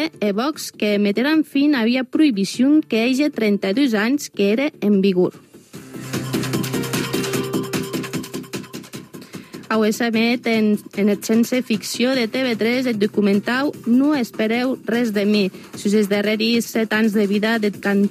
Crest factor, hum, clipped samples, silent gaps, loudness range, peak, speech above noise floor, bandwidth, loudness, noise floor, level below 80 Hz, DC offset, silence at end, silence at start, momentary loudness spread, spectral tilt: 14 dB; none; under 0.1%; none; 6 LU; -6 dBFS; 22 dB; 15.5 kHz; -19 LUFS; -40 dBFS; -64 dBFS; under 0.1%; 0 s; 0 s; 10 LU; -5 dB/octave